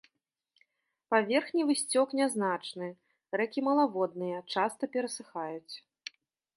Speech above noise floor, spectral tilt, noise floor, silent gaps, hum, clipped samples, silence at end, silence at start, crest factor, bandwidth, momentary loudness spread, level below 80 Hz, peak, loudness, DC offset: 50 dB; -3.5 dB/octave; -80 dBFS; none; none; under 0.1%; 0.75 s; 1.1 s; 20 dB; 11.5 kHz; 16 LU; -86 dBFS; -12 dBFS; -31 LUFS; under 0.1%